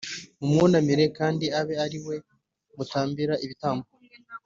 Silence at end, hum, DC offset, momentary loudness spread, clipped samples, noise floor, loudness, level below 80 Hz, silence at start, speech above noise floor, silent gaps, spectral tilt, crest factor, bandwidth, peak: 0.1 s; none; under 0.1%; 16 LU; under 0.1%; -46 dBFS; -26 LUFS; -62 dBFS; 0 s; 22 dB; none; -6 dB/octave; 18 dB; 7.6 kHz; -8 dBFS